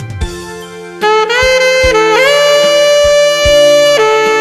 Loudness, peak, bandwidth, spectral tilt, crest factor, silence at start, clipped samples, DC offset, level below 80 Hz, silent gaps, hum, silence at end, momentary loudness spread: -8 LUFS; 0 dBFS; 14 kHz; -2.5 dB/octave; 8 dB; 0 s; 0.4%; under 0.1%; -28 dBFS; none; none; 0 s; 15 LU